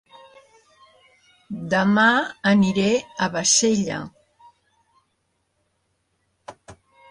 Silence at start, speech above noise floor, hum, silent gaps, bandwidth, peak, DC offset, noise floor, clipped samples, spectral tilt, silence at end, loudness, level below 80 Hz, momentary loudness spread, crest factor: 1.5 s; 52 dB; none; none; 11.5 kHz; -6 dBFS; under 0.1%; -71 dBFS; under 0.1%; -3.5 dB/octave; 0.35 s; -19 LUFS; -60 dBFS; 16 LU; 18 dB